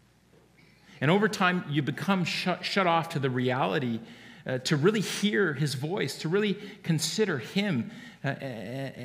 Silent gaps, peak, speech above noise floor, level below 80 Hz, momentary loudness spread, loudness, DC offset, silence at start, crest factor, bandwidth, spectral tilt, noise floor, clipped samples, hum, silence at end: none; -10 dBFS; 32 dB; -72 dBFS; 11 LU; -28 LUFS; under 0.1%; 0.9 s; 20 dB; 15.5 kHz; -5 dB/octave; -60 dBFS; under 0.1%; none; 0 s